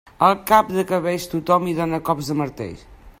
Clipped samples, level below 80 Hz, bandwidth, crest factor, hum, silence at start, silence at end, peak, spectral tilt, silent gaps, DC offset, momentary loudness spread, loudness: under 0.1%; -48 dBFS; 16 kHz; 20 dB; none; 0.2 s; 0.1 s; 0 dBFS; -6 dB/octave; none; under 0.1%; 9 LU; -20 LUFS